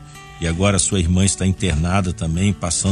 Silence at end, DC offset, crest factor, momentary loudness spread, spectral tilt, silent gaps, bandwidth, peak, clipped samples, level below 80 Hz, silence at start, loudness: 0 s; under 0.1%; 18 dB; 7 LU; -4.5 dB/octave; none; 11.5 kHz; 0 dBFS; under 0.1%; -32 dBFS; 0 s; -19 LUFS